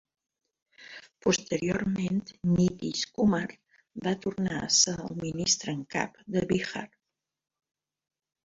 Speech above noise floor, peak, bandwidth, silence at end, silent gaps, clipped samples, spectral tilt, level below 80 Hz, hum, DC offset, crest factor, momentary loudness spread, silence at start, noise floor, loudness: 59 dB; -8 dBFS; 7.8 kHz; 1.6 s; none; under 0.1%; -4 dB/octave; -58 dBFS; none; under 0.1%; 22 dB; 15 LU; 0.8 s; -88 dBFS; -28 LUFS